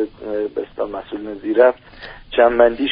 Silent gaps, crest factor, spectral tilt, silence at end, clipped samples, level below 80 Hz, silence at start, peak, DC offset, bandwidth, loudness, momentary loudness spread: none; 18 dB; -2 dB/octave; 0 s; under 0.1%; -46 dBFS; 0 s; 0 dBFS; under 0.1%; 5.4 kHz; -18 LUFS; 17 LU